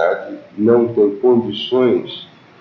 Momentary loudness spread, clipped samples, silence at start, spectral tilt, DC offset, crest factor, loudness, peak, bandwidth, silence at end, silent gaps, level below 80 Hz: 16 LU; under 0.1%; 0 s; -8 dB/octave; under 0.1%; 16 dB; -16 LUFS; 0 dBFS; 6 kHz; 0.35 s; none; -62 dBFS